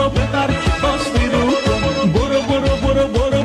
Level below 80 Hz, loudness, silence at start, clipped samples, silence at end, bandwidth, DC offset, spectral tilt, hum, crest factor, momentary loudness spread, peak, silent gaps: -24 dBFS; -17 LUFS; 0 s; under 0.1%; 0 s; 13 kHz; under 0.1%; -6 dB/octave; none; 10 dB; 2 LU; -6 dBFS; none